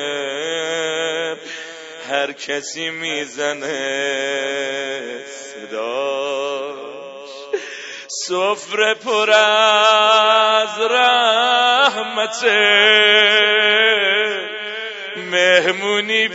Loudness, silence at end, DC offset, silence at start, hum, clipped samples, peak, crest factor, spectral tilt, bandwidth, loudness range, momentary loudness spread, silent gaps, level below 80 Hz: -16 LUFS; 0 s; under 0.1%; 0 s; none; under 0.1%; 0 dBFS; 18 dB; -1 dB/octave; 8 kHz; 11 LU; 17 LU; none; -74 dBFS